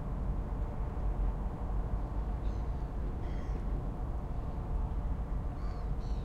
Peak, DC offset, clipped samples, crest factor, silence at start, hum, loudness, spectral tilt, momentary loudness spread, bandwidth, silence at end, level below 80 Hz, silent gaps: -24 dBFS; under 0.1%; under 0.1%; 12 dB; 0 s; none; -39 LUFS; -9 dB/octave; 2 LU; 4.9 kHz; 0 s; -36 dBFS; none